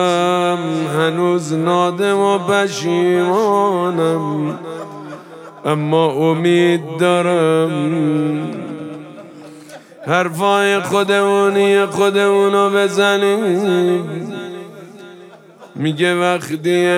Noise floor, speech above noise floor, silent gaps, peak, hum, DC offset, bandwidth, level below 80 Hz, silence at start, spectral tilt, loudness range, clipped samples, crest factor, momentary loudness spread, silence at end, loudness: -41 dBFS; 26 dB; none; 0 dBFS; none; under 0.1%; 16 kHz; -72 dBFS; 0 s; -5.5 dB/octave; 5 LU; under 0.1%; 16 dB; 16 LU; 0 s; -15 LUFS